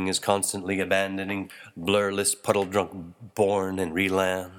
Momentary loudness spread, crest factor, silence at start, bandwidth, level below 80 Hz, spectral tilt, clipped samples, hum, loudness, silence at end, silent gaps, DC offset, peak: 9 LU; 20 dB; 0 s; 18.5 kHz; -64 dBFS; -3.5 dB/octave; under 0.1%; none; -25 LUFS; 0 s; none; under 0.1%; -6 dBFS